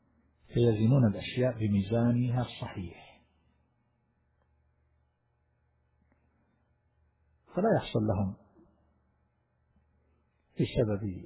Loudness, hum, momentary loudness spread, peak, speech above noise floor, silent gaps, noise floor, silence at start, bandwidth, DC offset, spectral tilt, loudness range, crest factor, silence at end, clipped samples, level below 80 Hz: -30 LUFS; none; 14 LU; -16 dBFS; 46 dB; none; -74 dBFS; 0.5 s; 4 kHz; under 0.1%; -8 dB/octave; 12 LU; 18 dB; 0 s; under 0.1%; -54 dBFS